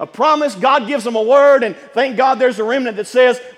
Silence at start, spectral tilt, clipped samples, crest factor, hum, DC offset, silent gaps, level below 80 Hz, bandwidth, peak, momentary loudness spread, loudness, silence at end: 0 s; -4 dB/octave; under 0.1%; 14 dB; none; under 0.1%; none; -74 dBFS; 12 kHz; 0 dBFS; 8 LU; -14 LUFS; 0.05 s